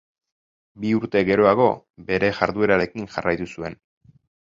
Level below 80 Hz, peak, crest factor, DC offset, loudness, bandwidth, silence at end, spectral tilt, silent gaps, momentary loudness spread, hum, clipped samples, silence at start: -52 dBFS; 0 dBFS; 22 dB; under 0.1%; -21 LUFS; 7.6 kHz; 0.75 s; -7 dB/octave; 1.90-1.94 s; 14 LU; none; under 0.1%; 0.8 s